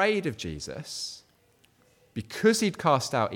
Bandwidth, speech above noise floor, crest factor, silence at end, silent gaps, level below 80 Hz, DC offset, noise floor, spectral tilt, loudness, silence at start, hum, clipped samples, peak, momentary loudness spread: 18.5 kHz; 37 dB; 20 dB; 0 s; none; -58 dBFS; under 0.1%; -64 dBFS; -4.5 dB/octave; -28 LUFS; 0 s; none; under 0.1%; -8 dBFS; 16 LU